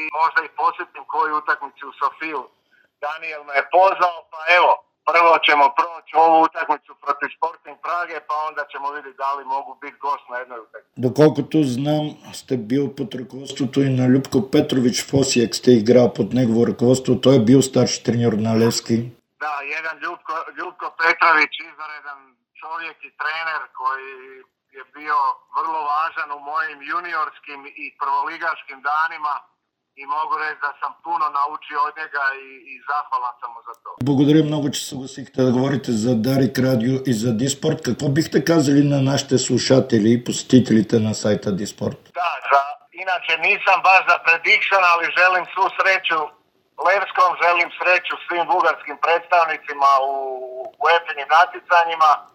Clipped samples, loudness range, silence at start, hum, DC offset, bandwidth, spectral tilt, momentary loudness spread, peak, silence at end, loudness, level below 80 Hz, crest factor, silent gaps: under 0.1%; 8 LU; 0 s; none; under 0.1%; 18 kHz; -5 dB/octave; 15 LU; 0 dBFS; 0.1 s; -19 LUFS; -64 dBFS; 20 dB; none